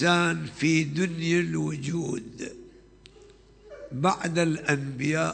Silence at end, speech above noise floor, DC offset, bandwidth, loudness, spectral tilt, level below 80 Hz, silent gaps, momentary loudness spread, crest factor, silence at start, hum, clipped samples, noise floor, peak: 0 s; 27 dB; under 0.1%; 9.2 kHz; -26 LUFS; -5 dB/octave; -58 dBFS; none; 15 LU; 18 dB; 0 s; none; under 0.1%; -53 dBFS; -10 dBFS